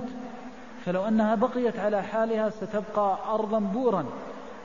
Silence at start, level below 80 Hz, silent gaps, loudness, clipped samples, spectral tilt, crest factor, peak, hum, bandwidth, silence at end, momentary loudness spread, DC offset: 0 s; -64 dBFS; none; -27 LUFS; under 0.1%; -7.5 dB/octave; 16 dB; -12 dBFS; none; 7.4 kHz; 0 s; 15 LU; 0.4%